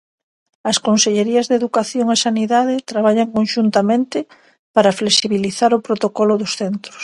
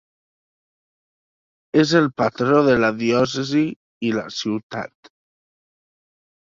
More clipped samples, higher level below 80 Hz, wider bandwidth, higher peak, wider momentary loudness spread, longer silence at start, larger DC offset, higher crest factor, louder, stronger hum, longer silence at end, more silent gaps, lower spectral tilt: neither; about the same, -62 dBFS vs -58 dBFS; first, 11.5 kHz vs 7.6 kHz; about the same, 0 dBFS vs -2 dBFS; second, 7 LU vs 11 LU; second, 0.65 s vs 1.75 s; neither; about the same, 16 dB vs 20 dB; first, -16 LUFS vs -20 LUFS; neither; second, 0 s vs 1.65 s; second, 4.59-4.74 s vs 3.76-4.01 s, 4.63-4.70 s; second, -3.5 dB/octave vs -5.5 dB/octave